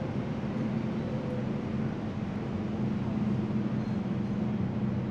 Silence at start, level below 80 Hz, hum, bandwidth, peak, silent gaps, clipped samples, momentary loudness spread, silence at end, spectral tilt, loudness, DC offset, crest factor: 0 s; -52 dBFS; none; 7.4 kHz; -20 dBFS; none; under 0.1%; 3 LU; 0 s; -9 dB/octave; -32 LUFS; under 0.1%; 12 dB